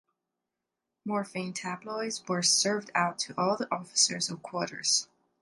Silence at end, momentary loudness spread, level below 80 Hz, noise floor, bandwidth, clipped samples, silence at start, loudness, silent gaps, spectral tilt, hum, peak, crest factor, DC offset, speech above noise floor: 0.4 s; 11 LU; -80 dBFS; -87 dBFS; 11.5 kHz; under 0.1%; 1.05 s; -29 LUFS; none; -2 dB/octave; none; -10 dBFS; 22 dB; under 0.1%; 56 dB